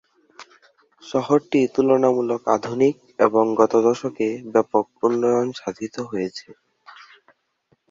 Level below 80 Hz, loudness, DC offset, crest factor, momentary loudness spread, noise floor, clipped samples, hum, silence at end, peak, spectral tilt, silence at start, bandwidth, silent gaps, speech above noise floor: -66 dBFS; -21 LUFS; under 0.1%; 20 dB; 11 LU; -66 dBFS; under 0.1%; none; 1.4 s; -2 dBFS; -6 dB/octave; 0.4 s; 7.6 kHz; none; 46 dB